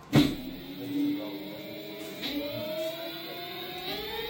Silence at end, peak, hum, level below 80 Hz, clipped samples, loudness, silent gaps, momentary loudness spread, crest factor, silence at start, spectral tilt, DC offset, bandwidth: 0 s; -8 dBFS; none; -54 dBFS; under 0.1%; -33 LUFS; none; 10 LU; 24 dB; 0 s; -5.5 dB/octave; under 0.1%; 17 kHz